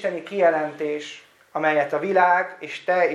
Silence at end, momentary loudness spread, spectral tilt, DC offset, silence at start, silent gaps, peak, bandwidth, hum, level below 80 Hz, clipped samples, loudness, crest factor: 0 s; 12 LU; -5 dB/octave; under 0.1%; 0 s; none; -4 dBFS; 11 kHz; none; -84 dBFS; under 0.1%; -22 LUFS; 18 dB